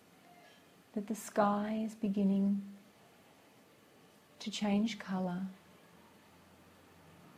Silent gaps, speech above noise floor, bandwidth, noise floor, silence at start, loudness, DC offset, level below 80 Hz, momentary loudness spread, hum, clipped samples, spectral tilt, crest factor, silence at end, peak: none; 29 dB; 15 kHz; -63 dBFS; 0.95 s; -35 LUFS; under 0.1%; -76 dBFS; 15 LU; none; under 0.1%; -6 dB/octave; 22 dB; 0.1 s; -16 dBFS